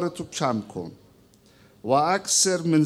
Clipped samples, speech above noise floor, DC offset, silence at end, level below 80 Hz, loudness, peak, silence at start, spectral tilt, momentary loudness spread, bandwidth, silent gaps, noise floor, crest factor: under 0.1%; 32 dB; under 0.1%; 0 s; -66 dBFS; -23 LUFS; -8 dBFS; 0 s; -3.5 dB/octave; 18 LU; 15.5 kHz; none; -56 dBFS; 18 dB